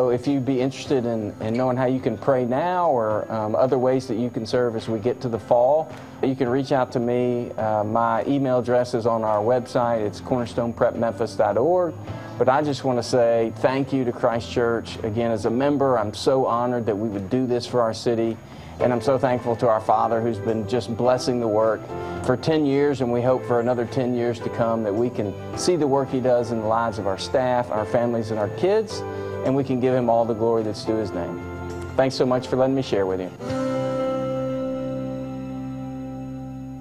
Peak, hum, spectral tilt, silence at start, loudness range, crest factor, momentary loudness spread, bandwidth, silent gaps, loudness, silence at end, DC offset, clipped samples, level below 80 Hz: -4 dBFS; none; -6.5 dB/octave; 0 s; 2 LU; 20 dB; 8 LU; 14 kHz; none; -23 LUFS; 0 s; under 0.1%; under 0.1%; -56 dBFS